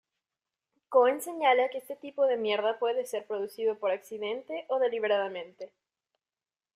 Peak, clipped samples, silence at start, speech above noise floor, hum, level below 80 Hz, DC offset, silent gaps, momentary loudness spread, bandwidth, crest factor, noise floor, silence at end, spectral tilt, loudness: -10 dBFS; under 0.1%; 0.9 s; over 61 dB; none; -84 dBFS; under 0.1%; none; 14 LU; 15 kHz; 20 dB; under -90 dBFS; 1.1 s; -3 dB/octave; -29 LUFS